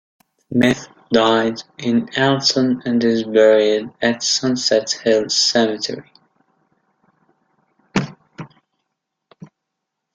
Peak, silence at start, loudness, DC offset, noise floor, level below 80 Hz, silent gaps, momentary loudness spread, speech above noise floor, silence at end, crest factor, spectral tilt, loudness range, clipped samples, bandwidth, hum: -2 dBFS; 0.5 s; -17 LUFS; under 0.1%; -79 dBFS; -58 dBFS; none; 11 LU; 62 dB; 0.7 s; 18 dB; -3.5 dB/octave; 16 LU; under 0.1%; 9.6 kHz; none